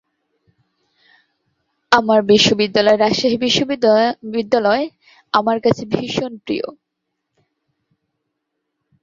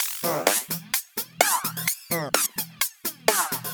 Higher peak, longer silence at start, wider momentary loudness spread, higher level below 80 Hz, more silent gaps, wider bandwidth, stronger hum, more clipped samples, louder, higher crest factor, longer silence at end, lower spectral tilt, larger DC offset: about the same, 0 dBFS vs -2 dBFS; first, 1.9 s vs 0 s; first, 11 LU vs 5 LU; first, -56 dBFS vs -72 dBFS; neither; second, 7.8 kHz vs over 20 kHz; neither; neither; first, -16 LUFS vs -24 LUFS; second, 18 dB vs 26 dB; first, 2.3 s vs 0 s; first, -4.5 dB/octave vs -1.5 dB/octave; neither